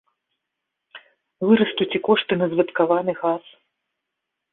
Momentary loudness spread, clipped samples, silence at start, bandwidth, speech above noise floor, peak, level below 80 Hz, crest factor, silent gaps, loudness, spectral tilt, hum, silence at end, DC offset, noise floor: 7 LU; under 0.1%; 0.95 s; 4.1 kHz; 61 dB; -4 dBFS; -68 dBFS; 20 dB; none; -21 LUFS; -10.5 dB/octave; none; 1.15 s; under 0.1%; -81 dBFS